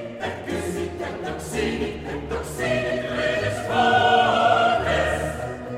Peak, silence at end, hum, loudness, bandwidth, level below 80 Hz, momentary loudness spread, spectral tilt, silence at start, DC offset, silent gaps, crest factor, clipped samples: -4 dBFS; 0 s; none; -23 LUFS; 16 kHz; -42 dBFS; 13 LU; -4.5 dB/octave; 0 s; under 0.1%; none; 18 dB; under 0.1%